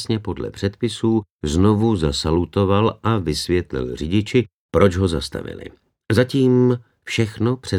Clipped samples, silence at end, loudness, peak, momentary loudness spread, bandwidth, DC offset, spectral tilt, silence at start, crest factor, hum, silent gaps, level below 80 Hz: under 0.1%; 0 s; -20 LUFS; -2 dBFS; 9 LU; 13.5 kHz; under 0.1%; -6.5 dB/octave; 0 s; 18 dB; none; 1.30-1.39 s, 4.54-4.69 s; -40 dBFS